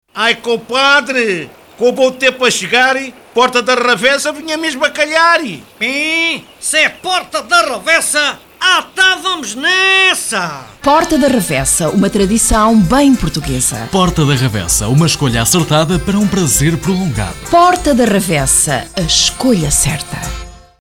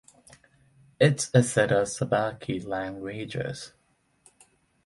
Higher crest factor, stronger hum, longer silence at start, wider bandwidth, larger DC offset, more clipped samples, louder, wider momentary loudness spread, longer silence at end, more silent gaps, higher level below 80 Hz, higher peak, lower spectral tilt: second, 12 dB vs 22 dB; neither; second, 0.15 s vs 1 s; first, 18.5 kHz vs 11.5 kHz; first, 0.1% vs under 0.1%; neither; first, -12 LUFS vs -26 LUFS; second, 8 LU vs 13 LU; second, 0.25 s vs 1.2 s; neither; first, -30 dBFS vs -60 dBFS; first, 0 dBFS vs -6 dBFS; second, -3.5 dB/octave vs -5 dB/octave